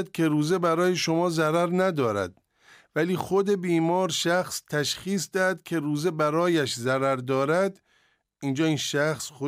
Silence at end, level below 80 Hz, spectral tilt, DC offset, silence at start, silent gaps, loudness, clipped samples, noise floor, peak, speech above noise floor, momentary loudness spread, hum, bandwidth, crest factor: 0 s; -68 dBFS; -5 dB/octave; under 0.1%; 0 s; none; -25 LUFS; under 0.1%; -67 dBFS; -12 dBFS; 42 dB; 5 LU; none; 16 kHz; 14 dB